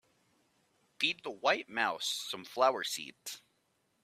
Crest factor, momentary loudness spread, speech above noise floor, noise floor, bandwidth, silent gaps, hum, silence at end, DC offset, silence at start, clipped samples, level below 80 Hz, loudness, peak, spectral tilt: 24 dB; 14 LU; 42 dB; -76 dBFS; 16 kHz; none; none; 0.65 s; under 0.1%; 1 s; under 0.1%; -86 dBFS; -33 LUFS; -12 dBFS; -1 dB/octave